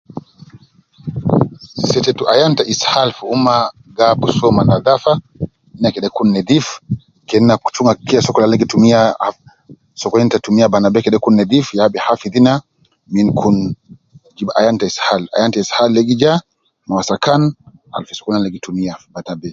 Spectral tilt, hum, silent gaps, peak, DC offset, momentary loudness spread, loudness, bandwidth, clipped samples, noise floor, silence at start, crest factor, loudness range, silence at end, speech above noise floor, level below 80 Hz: -5.5 dB/octave; none; none; 0 dBFS; under 0.1%; 13 LU; -14 LUFS; 7.6 kHz; under 0.1%; -46 dBFS; 0.15 s; 14 dB; 3 LU; 0 s; 33 dB; -46 dBFS